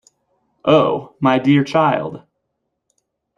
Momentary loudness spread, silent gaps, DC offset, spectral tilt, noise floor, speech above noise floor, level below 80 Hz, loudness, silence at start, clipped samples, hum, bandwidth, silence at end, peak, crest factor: 9 LU; none; under 0.1%; -7.5 dB/octave; -74 dBFS; 59 dB; -58 dBFS; -16 LUFS; 0.65 s; under 0.1%; none; 7.4 kHz; 1.2 s; -2 dBFS; 18 dB